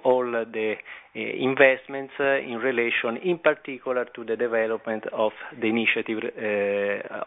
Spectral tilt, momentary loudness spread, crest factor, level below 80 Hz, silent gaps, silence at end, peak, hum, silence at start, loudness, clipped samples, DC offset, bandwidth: -7.5 dB/octave; 10 LU; 22 dB; -72 dBFS; none; 0 s; -2 dBFS; none; 0 s; -25 LUFS; under 0.1%; under 0.1%; 4 kHz